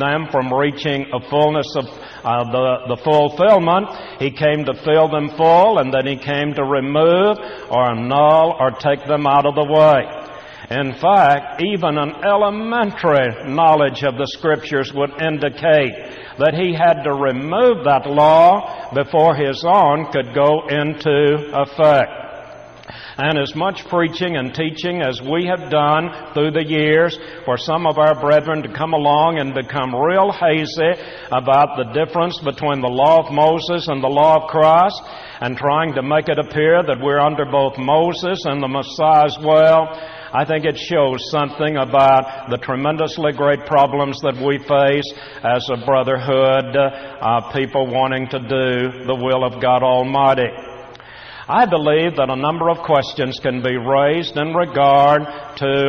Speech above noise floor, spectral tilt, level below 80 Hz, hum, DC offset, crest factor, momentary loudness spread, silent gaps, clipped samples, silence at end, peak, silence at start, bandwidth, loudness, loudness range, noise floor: 21 dB; -6.5 dB/octave; -52 dBFS; none; under 0.1%; 14 dB; 10 LU; none; under 0.1%; 0 s; -2 dBFS; 0 s; 6.6 kHz; -16 LUFS; 3 LU; -37 dBFS